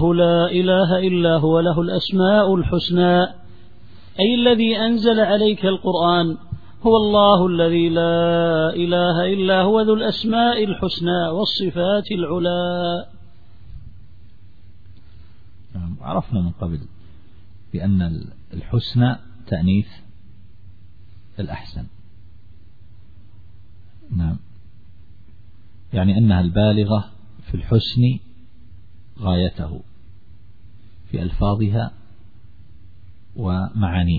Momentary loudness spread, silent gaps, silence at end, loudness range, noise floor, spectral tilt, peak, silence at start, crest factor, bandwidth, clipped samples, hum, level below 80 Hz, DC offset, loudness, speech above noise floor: 15 LU; none; 0 s; 16 LU; -48 dBFS; -9 dB/octave; -2 dBFS; 0 s; 18 dB; 4.9 kHz; under 0.1%; none; -40 dBFS; 1%; -19 LUFS; 30 dB